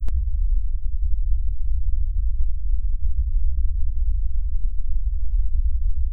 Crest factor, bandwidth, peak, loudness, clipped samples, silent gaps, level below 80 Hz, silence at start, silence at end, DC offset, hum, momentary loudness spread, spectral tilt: 10 dB; 0.3 kHz; -8 dBFS; -28 LUFS; under 0.1%; none; -20 dBFS; 0 s; 0 s; under 0.1%; none; 3 LU; -10.5 dB/octave